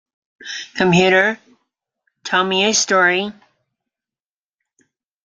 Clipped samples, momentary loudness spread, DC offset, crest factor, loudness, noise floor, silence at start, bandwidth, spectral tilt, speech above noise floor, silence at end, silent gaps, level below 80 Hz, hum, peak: under 0.1%; 18 LU; under 0.1%; 18 dB; -15 LUFS; under -90 dBFS; 0.45 s; 9.6 kHz; -3 dB/octave; over 74 dB; 1.9 s; none; -58 dBFS; none; -2 dBFS